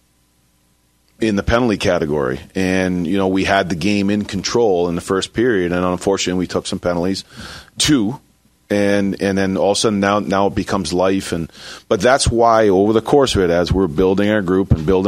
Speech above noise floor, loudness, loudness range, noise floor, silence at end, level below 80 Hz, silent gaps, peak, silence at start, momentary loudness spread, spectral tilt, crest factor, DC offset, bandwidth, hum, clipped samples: 43 dB; -17 LUFS; 4 LU; -59 dBFS; 0 s; -36 dBFS; none; 0 dBFS; 1.2 s; 8 LU; -5 dB/octave; 16 dB; under 0.1%; 15.5 kHz; none; under 0.1%